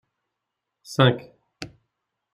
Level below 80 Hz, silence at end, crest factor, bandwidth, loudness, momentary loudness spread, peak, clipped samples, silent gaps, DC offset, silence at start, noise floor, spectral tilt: -62 dBFS; 0.7 s; 24 dB; 12.5 kHz; -22 LUFS; 21 LU; -4 dBFS; under 0.1%; none; under 0.1%; 0.9 s; -83 dBFS; -6 dB/octave